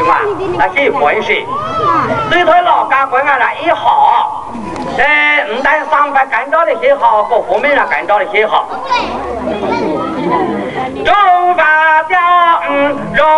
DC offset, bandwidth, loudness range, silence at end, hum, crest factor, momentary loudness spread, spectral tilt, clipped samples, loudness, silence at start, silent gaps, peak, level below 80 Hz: under 0.1%; 11.5 kHz; 3 LU; 0 s; none; 12 dB; 8 LU; -5 dB/octave; under 0.1%; -11 LUFS; 0 s; none; 0 dBFS; -42 dBFS